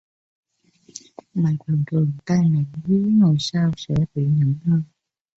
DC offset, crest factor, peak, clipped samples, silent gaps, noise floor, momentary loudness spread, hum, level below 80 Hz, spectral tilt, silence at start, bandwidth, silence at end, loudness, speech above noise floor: under 0.1%; 12 dB; -8 dBFS; under 0.1%; none; -57 dBFS; 19 LU; none; -52 dBFS; -7.5 dB/octave; 0.95 s; 7.8 kHz; 0.55 s; -21 LUFS; 37 dB